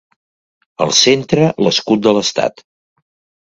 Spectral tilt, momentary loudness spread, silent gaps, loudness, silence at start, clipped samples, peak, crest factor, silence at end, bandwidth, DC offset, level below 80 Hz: -3.5 dB/octave; 9 LU; none; -13 LUFS; 0.8 s; under 0.1%; 0 dBFS; 16 dB; 0.9 s; 11 kHz; under 0.1%; -54 dBFS